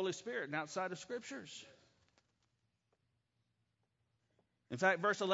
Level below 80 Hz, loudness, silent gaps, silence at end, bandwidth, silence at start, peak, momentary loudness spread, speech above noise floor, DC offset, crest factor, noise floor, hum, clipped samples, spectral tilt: -88 dBFS; -39 LUFS; none; 0 s; 7.6 kHz; 0 s; -18 dBFS; 16 LU; 44 dB; under 0.1%; 24 dB; -83 dBFS; none; under 0.1%; -2.5 dB/octave